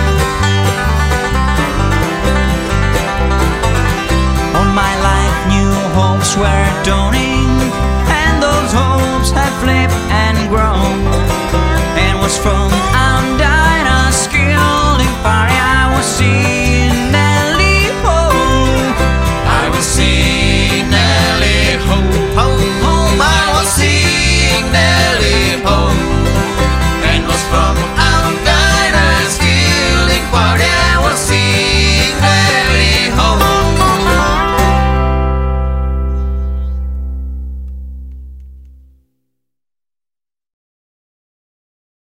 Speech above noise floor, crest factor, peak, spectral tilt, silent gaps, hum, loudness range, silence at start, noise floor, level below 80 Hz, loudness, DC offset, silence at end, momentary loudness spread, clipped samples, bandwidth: 77 dB; 12 dB; 0 dBFS; -4.5 dB/octave; none; none; 3 LU; 0 s; -89 dBFS; -18 dBFS; -11 LUFS; under 0.1%; 3.5 s; 4 LU; under 0.1%; 16 kHz